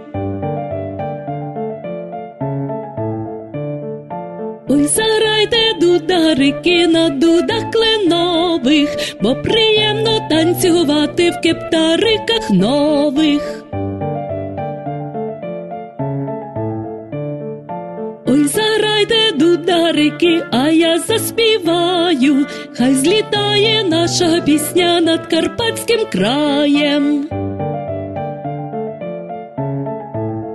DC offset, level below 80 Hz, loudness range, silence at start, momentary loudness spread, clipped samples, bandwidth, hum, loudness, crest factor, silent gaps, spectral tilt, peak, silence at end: under 0.1%; -46 dBFS; 10 LU; 0 s; 13 LU; under 0.1%; 13 kHz; none; -15 LUFS; 14 dB; none; -4.5 dB/octave; -2 dBFS; 0 s